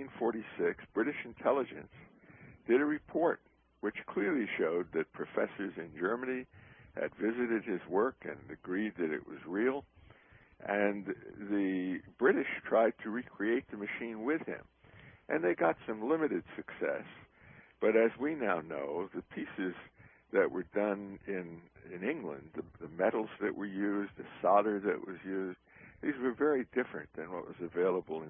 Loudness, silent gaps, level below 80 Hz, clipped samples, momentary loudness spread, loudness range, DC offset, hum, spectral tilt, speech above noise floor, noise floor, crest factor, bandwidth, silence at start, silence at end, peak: -35 LUFS; none; -70 dBFS; under 0.1%; 13 LU; 4 LU; under 0.1%; none; -1.5 dB/octave; 27 dB; -61 dBFS; 22 dB; 3.7 kHz; 0 s; 0 s; -14 dBFS